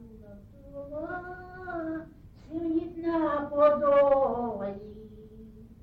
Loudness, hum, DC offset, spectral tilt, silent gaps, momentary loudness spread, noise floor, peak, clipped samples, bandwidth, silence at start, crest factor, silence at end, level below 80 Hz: -28 LUFS; none; under 0.1%; -9 dB/octave; none; 24 LU; -49 dBFS; -12 dBFS; under 0.1%; 4.7 kHz; 0 s; 18 dB; 0.1 s; -54 dBFS